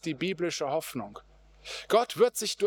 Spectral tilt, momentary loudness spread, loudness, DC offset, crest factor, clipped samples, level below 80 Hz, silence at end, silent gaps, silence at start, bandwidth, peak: -3.5 dB/octave; 15 LU; -29 LUFS; under 0.1%; 20 dB; under 0.1%; -64 dBFS; 0 s; none; 0.05 s; over 20 kHz; -10 dBFS